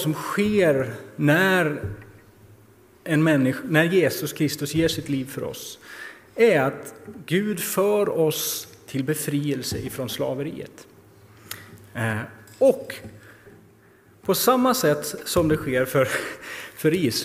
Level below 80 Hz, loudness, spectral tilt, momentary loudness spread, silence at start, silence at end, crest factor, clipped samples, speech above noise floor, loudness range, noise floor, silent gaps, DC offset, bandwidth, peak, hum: -54 dBFS; -23 LUFS; -5 dB/octave; 19 LU; 0 s; 0 s; 22 dB; under 0.1%; 31 dB; 6 LU; -54 dBFS; none; under 0.1%; 16 kHz; -2 dBFS; none